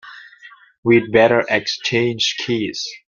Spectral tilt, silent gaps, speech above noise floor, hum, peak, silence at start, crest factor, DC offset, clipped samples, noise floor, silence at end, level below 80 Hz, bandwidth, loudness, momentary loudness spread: -4.5 dB/octave; 0.78-0.83 s; 28 dB; none; 0 dBFS; 0.05 s; 18 dB; under 0.1%; under 0.1%; -45 dBFS; 0.1 s; -56 dBFS; 7.4 kHz; -17 LUFS; 8 LU